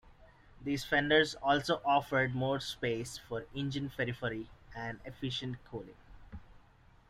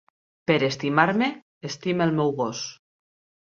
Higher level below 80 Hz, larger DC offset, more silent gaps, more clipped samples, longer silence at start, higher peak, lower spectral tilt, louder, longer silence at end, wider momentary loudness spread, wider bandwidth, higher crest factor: first, -58 dBFS vs -66 dBFS; neither; second, none vs 1.42-1.61 s; neither; second, 0.05 s vs 0.5 s; second, -12 dBFS vs -2 dBFS; about the same, -5 dB/octave vs -5.5 dB/octave; second, -34 LUFS vs -24 LUFS; second, 0.5 s vs 0.65 s; first, 19 LU vs 14 LU; first, 16 kHz vs 7.4 kHz; about the same, 22 dB vs 22 dB